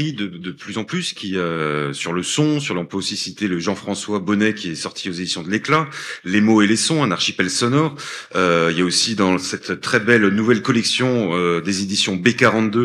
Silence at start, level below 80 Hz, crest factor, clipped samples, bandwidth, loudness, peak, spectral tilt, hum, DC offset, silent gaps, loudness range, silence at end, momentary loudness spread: 0 s; -62 dBFS; 18 dB; under 0.1%; 13 kHz; -19 LUFS; 0 dBFS; -4 dB/octave; none; under 0.1%; none; 5 LU; 0 s; 10 LU